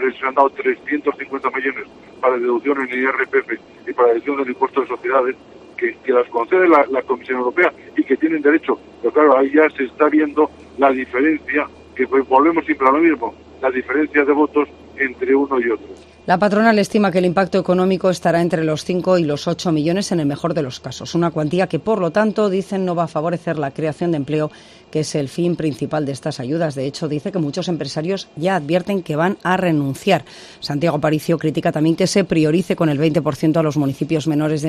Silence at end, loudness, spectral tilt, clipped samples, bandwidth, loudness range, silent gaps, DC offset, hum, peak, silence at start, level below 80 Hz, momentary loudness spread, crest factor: 0 s; -18 LUFS; -6.5 dB/octave; under 0.1%; 13 kHz; 5 LU; none; under 0.1%; none; 0 dBFS; 0 s; -56 dBFS; 8 LU; 18 dB